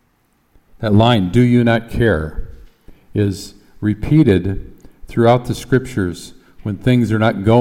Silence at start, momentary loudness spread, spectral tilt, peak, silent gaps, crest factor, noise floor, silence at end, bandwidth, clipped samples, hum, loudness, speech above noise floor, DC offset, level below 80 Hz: 0.8 s; 16 LU; -7.5 dB/octave; -2 dBFS; none; 14 dB; -60 dBFS; 0 s; 14.5 kHz; under 0.1%; none; -16 LUFS; 45 dB; under 0.1%; -36 dBFS